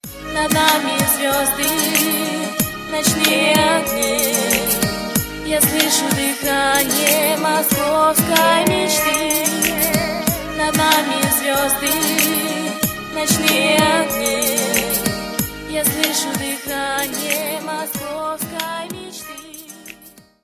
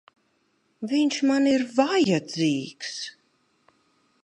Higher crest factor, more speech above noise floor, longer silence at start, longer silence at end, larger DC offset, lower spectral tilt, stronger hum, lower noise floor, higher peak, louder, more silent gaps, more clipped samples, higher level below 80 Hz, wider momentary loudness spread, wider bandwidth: about the same, 18 dB vs 20 dB; second, 28 dB vs 46 dB; second, 0.05 s vs 0.8 s; second, 0.35 s vs 1.15 s; neither; second, -2.5 dB/octave vs -5 dB/octave; neither; second, -45 dBFS vs -69 dBFS; first, 0 dBFS vs -6 dBFS; first, -16 LUFS vs -24 LUFS; neither; neither; first, -42 dBFS vs -74 dBFS; second, 10 LU vs 13 LU; first, 16 kHz vs 10.5 kHz